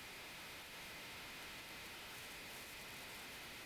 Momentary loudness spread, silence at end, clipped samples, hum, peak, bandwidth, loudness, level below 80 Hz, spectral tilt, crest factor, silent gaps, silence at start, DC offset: 1 LU; 0 s; under 0.1%; none; -40 dBFS; 16 kHz; -50 LUFS; -70 dBFS; -1.5 dB/octave; 12 dB; none; 0 s; under 0.1%